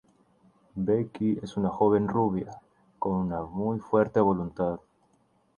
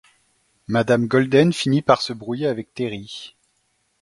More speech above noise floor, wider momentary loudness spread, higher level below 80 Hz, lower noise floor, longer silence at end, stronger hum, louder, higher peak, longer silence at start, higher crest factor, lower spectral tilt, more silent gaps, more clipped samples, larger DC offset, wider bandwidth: second, 41 dB vs 48 dB; second, 10 LU vs 16 LU; about the same, -56 dBFS vs -60 dBFS; about the same, -67 dBFS vs -68 dBFS; about the same, 0.8 s vs 0.7 s; neither; second, -28 LUFS vs -20 LUFS; second, -8 dBFS vs 0 dBFS; about the same, 0.75 s vs 0.7 s; about the same, 20 dB vs 20 dB; first, -9.5 dB/octave vs -6 dB/octave; neither; neither; neither; second, 7 kHz vs 11.5 kHz